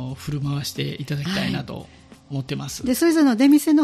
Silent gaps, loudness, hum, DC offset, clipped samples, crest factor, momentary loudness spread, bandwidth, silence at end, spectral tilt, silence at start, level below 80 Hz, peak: none; -21 LUFS; none; under 0.1%; under 0.1%; 14 dB; 15 LU; 15.5 kHz; 0 s; -5.5 dB/octave; 0 s; -50 dBFS; -6 dBFS